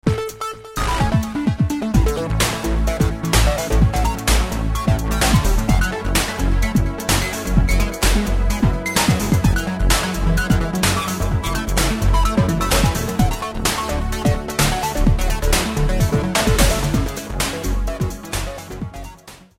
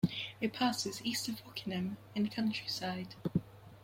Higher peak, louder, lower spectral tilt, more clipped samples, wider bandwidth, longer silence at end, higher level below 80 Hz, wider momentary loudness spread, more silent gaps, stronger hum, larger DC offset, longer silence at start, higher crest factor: first, -2 dBFS vs -18 dBFS; first, -19 LUFS vs -37 LUFS; about the same, -4.5 dB/octave vs -4.5 dB/octave; neither; about the same, 16.5 kHz vs 16.5 kHz; first, 0.25 s vs 0 s; first, -22 dBFS vs -68 dBFS; about the same, 7 LU vs 7 LU; neither; neither; neither; about the same, 0.05 s vs 0.05 s; about the same, 16 dB vs 20 dB